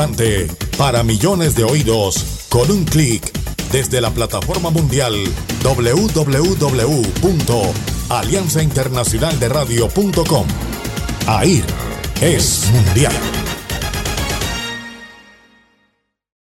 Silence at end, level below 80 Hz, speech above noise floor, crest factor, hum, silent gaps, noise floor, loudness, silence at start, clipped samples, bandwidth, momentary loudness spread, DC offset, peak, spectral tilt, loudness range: 1.25 s; -28 dBFS; 50 dB; 14 dB; none; none; -65 dBFS; -16 LUFS; 0 s; under 0.1%; 17 kHz; 9 LU; under 0.1%; -2 dBFS; -4.5 dB/octave; 1 LU